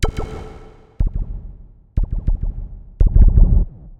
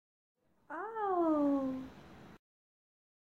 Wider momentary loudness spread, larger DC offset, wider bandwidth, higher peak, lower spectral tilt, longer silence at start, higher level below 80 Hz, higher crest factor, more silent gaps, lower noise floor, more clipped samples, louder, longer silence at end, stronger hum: about the same, 21 LU vs 22 LU; neither; first, 7.8 kHz vs 7 kHz; first, 0 dBFS vs -22 dBFS; about the same, -7.5 dB/octave vs -8 dB/octave; second, 0 s vs 0.7 s; first, -18 dBFS vs -70 dBFS; about the same, 16 dB vs 16 dB; neither; second, -40 dBFS vs -55 dBFS; neither; first, -20 LUFS vs -34 LUFS; second, 0.1 s vs 1 s; neither